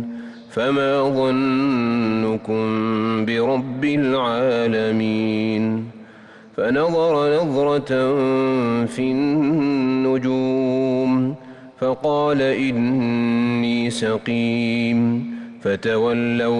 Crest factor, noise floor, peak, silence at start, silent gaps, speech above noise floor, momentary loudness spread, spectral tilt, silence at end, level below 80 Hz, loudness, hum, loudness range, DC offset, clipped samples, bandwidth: 8 dB; -44 dBFS; -10 dBFS; 0 s; none; 25 dB; 5 LU; -7 dB/octave; 0 s; -58 dBFS; -20 LUFS; none; 1 LU; under 0.1%; under 0.1%; 10.5 kHz